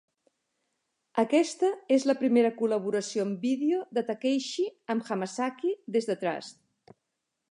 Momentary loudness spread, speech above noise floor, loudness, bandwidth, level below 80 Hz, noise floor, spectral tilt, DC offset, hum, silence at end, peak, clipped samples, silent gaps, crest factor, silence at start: 8 LU; 55 dB; -28 LUFS; 11 kHz; -84 dBFS; -83 dBFS; -5 dB/octave; under 0.1%; none; 1 s; -10 dBFS; under 0.1%; none; 18 dB; 1.15 s